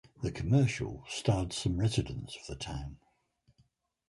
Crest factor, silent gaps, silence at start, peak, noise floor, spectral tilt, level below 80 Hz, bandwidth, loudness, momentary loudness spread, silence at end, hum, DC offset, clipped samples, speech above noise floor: 22 dB; none; 0.2 s; -12 dBFS; -71 dBFS; -6 dB/octave; -48 dBFS; 11.5 kHz; -33 LUFS; 14 LU; 1.15 s; none; under 0.1%; under 0.1%; 39 dB